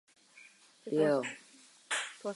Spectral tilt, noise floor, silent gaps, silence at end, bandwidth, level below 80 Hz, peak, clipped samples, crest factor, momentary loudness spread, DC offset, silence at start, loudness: -4 dB/octave; -59 dBFS; none; 0 s; 11.5 kHz; under -90 dBFS; -18 dBFS; under 0.1%; 18 dB; 19 LU; under 0.1%; 0.35 s; -33 LUFS